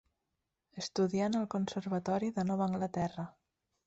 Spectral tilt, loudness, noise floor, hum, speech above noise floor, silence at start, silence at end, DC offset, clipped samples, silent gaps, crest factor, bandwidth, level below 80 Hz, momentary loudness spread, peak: -6.5 dB/octave; -35 LUFS; -86 dBFS; none; 52 dB; 0.75 s; 0.55 s; under 0.1%; under 0.1%; none; 14 dB; 8 kHz; -68 dBFS; 11 LU; -22 dBFS